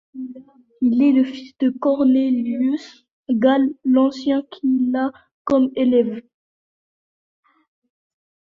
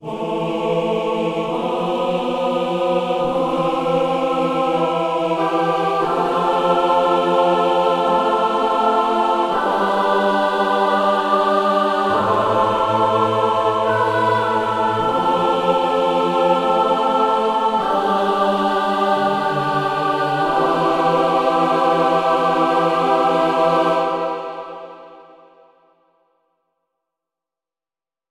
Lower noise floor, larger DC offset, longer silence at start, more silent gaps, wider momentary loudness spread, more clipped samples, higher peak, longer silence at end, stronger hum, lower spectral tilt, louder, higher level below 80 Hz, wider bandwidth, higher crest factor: about the same, under -90 dBFS vs under -90 dBFS; neither; first, 0.15 s vs 0 s; first, 3.11-3.25 s, 5.32-5.45 s vs none; first, 11 LU vs 4 LU; neither; about the same, -4 dBFS vs -4 dBFS; second, 2.25 s vs 3.1 s; neither; about the same, -7 dB/octave vs -6 dB/octave; about the same, -19 LUFS vs -18 LUFS; second, -62 dBFS vs -54 dBFS; second, 7 kHz vs 13.5 kHz; about the same, 16 dB vs 14 dB